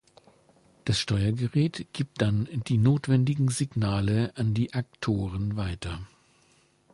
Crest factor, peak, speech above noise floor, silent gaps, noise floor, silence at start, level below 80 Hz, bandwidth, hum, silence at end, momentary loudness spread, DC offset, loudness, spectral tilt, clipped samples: 16 dB; -10 dBFS; 37 dB; none; -64 dBFS; 0.85 s; -48 dBFS; 11.5 kHz; none; 0.85 s; 10 LU; under 0.1%; -27 LUFS; -6.5 dB/octave; under 0.1%